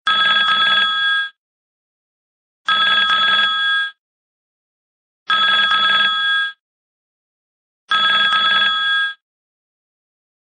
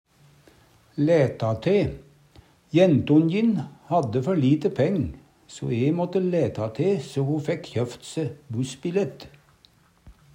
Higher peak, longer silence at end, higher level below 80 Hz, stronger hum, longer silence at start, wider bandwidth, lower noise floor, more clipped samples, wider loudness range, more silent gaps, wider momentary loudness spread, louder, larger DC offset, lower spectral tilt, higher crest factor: about the same, -4 dBFS vs -6 dBFS; first, 1.45 s vs 0.25 s; second, -70 dBFS vs -54 dBFS; neither; second, 0.05 s vs 0.95 s; second, 9.4 kHz vs 11 kHz; first, under -90 dBFS vs -59 dBFS; neither; second, 2 LU vs 5 LU; first, 1.38-2.65 s, 3.98-5.26 s, 6.60-7.88 s vs none; second, 7 LU vs 12 LU; first, -14 LUFS vs -24 LUFS; neither; second, -0.5 dB/octave vs -7.5 dB/octave; about the same, 16 dB vs 18 dB